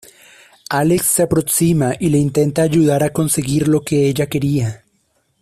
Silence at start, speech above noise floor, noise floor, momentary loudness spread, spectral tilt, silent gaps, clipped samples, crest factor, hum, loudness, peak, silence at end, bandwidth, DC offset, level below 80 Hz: 0.7 s; 48 dB; -63 dBFS; 5 LU; -5.5 dB/octave; none; under 0.1%; 12 dB; none; -16 LUFS; -4 dBFS; 0.65 s; 15 kHz; under 0.1%; -46 dBFS